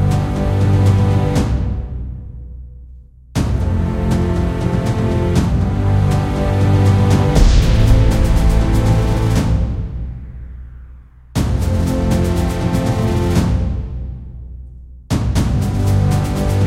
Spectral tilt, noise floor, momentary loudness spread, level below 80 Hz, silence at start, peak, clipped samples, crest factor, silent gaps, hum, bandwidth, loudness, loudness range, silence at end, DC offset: -7 dB/octave; -39 dBFS; 18 LU; -20 dBFS; 0 s; 0 dBFS; under 0.1%; 14 dB; none; none; 15 kHz; -16 LUFS; 6 LU; 0 s; under 0.1%